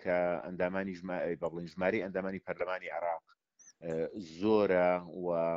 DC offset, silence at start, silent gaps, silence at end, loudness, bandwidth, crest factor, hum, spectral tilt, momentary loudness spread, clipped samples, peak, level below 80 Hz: under 0.1%; 0 s; none; 0 s; -34 LUFS; 7.6 kHz; 18 dB; none; -5.5 dB/octave; 11 LU; under 0.1%; -16 dBFS; -68 dBFS